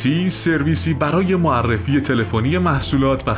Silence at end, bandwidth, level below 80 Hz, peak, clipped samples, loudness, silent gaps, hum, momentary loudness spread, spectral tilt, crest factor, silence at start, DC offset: 0 s; 4 kHz; -32 dBFS; -6 dBFS; under 0.1%; -18 LUFS; none; none; 2 LU; -11.5 dB/octave; 12 dB; 0 s; under 0.1%